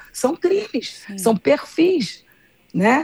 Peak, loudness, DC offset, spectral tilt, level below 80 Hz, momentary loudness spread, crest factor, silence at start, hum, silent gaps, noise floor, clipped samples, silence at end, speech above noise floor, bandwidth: -4 dBFS; -20 LUFS; under 0.1%; -5 dB/octave; -64 dBFS; 11 LU; 16 dB; 0 s; none; none; -56 dBFS; under 0.1%; 0 s; 37 dB; over 20 kHz